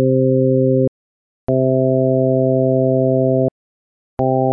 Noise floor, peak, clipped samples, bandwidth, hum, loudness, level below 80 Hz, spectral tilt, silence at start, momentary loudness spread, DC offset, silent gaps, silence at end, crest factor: under -90 dBFS; -6 dBFS; under 0.1%; 1.6 kHz; none; -16 LUFS; -50 dBFS; -15 dB/octave; 0 s; 7 LU; under 0.1%; 0.88-1.47 s, 3.51-4.17 s; 0 s; 10 dB